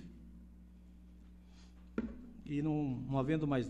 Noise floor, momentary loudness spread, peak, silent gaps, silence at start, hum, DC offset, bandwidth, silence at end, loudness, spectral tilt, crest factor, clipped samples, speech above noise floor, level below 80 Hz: -57 dBFS; 24 LU; -22 dBFS; none; 0 s; none; under 0.1%; 8.4 kHz; 0 s; -38 LUFS; -8.5 dB/octave; 18 dB; under 0.1%; 22 dB; -56 dBFS